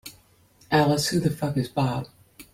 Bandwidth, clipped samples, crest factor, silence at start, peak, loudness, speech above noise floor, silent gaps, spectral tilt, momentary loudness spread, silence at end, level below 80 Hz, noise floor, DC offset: 16.5 kHz; under 0.1%; 18 dB; 0.05 s; -8 dBFS; -24 LUFS; 35 dB; none; -5.5 dB/octave; 15 LU; 0.1 s; -54 dBFS; -58 dBFS; under 0.1%